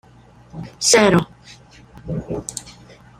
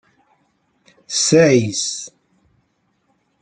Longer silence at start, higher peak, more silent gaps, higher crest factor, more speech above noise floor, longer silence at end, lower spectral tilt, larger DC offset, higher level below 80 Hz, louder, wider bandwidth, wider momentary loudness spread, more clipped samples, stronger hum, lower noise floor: second, 0.55 s vs 1.1 s; about the same, -2 dBFS vs 0 dBFS; neither; about the same, 20 dB vs 20 dB; second, 30 dB vs 50 dB; second, 0.5 s vs 1.35 s; about the same, -3.5 dB/octave vs -4 dB/octave; neither; first, -46 dBFS vs -60 dBFS; about the same, -17 LUFS vs -16 LUFS; first, 15 kHz vs 9.6 kHz; first, 24 LU vs 16 LU; neither; neither; second, -47 dBFS vs -65 dBFS